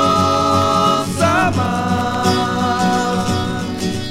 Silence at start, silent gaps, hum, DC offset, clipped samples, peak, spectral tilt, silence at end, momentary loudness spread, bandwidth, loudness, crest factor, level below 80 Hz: 0 s; none; none; under 0.1%; under 0.1%; 0 dBFS; -5 dB/octave; 0 s; 6 LU; 16.5 kHz; -16 LUFS; 16 dB; -42 dBFS